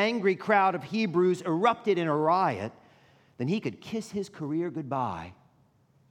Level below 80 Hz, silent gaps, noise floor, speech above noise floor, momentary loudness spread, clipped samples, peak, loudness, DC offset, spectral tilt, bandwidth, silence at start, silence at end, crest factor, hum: -72 dBFS; none; -64 dBFS; 37 dB; 12 LU; under 0.1%; -10 dBFS; -28 LUFS; under 0.1%; -6.5 dB/octave; 11 kHz; 0 s; 0.8 s; 18 dB; none